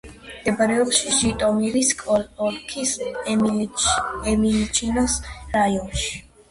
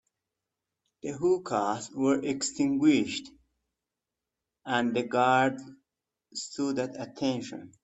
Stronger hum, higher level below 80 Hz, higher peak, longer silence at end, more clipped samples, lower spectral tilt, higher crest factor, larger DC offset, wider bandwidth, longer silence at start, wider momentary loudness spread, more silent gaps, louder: neither; first, -40 dBFS vs -70 dBFS; first, -4 dBFS vs -10 dBFS; first, 0.3 s vs 0.15 s; neither; second, -3 dB/octave vs -4.5 dB/octave; about the same, 18 dB vs 20 dB; neither; first, 11.5 kHz vs 8.4 kHz; second, 0.05 s vs 1.05 s; second, 8 LU vs 15 LU; neither; first, -21 LUFS vs -28 LUFS